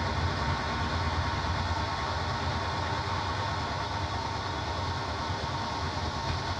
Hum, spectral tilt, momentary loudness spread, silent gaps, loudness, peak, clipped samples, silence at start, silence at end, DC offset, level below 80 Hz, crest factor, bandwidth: none; -5 dB/octave; 2 LU; none; -31 LUFS; -16 dBFS; under 0.1%; 0 s; 0 s; under 0.1%; -42 dBFS; 14 dB; 10 kHz